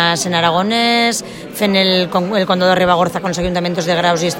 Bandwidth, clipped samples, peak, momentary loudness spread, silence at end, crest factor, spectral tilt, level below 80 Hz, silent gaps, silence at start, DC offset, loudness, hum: 16.5 kHz; under 0.1%; 0 dBFS; 6 LU; 0 s; 14 dB; -4 dB/octave; -42 dBFS; none; 0 s; under 0.1%; -14 LUFS; none